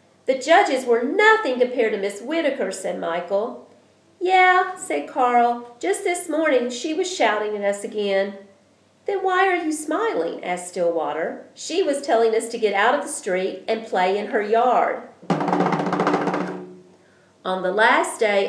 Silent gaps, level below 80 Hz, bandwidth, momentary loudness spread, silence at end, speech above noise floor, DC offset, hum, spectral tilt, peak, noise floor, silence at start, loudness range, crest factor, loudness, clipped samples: none; -82 dBFS; 11 kHz; 11 LU; 0 s; 36 dB; under 0.1%; none; -4 dB/octave; -2 dBFS; -57 dBFS; 0.25 s; 3 LU; 18 dB; -21 LUFS; under 0.1%